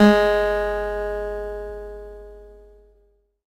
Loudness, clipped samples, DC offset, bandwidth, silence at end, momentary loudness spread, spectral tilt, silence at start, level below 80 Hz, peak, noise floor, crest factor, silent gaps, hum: -22 LUFS; under 0.1%; under 0.1%; 15.5 kHz; 0.95 s; 22 LU; -6.5 dB/octave; 0 s; -38 dBFS; 0 dBFS; -61 dBFS; 22 dB; none; none